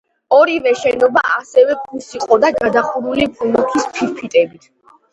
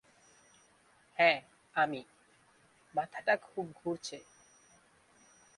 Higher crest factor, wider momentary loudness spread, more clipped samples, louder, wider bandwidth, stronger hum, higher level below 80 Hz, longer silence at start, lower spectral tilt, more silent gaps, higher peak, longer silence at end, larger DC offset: second, 16 dB vs 26 dB; second, 8 LU vs 17 LU; neither; first, -15 LUFS vs -34 LUFS; second, 8.2 kHz vs 11.5 kHz; neither; first, -52 dBFS vs -80 dBFS; second, 0.3 s vs 1.2 s; about the same, -4 dB/octave vs -3.5 dB/octave; neither; first, 0 dBFS vs -10 dBFS; second, 0.65 s vs 1.4 s; neither